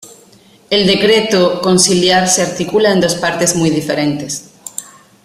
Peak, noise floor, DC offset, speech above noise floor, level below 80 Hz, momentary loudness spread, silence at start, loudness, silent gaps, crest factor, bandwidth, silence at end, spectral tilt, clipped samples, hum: 0 dBFS; -45 dBFS; under 0.1%; 33 dB; -50 dBFS; 14 LU; 0 s; -12 LUFS; none; 14 dB; 15.5 kHz; 0.4 s; -3.5 dB/octave; under 0.1%; none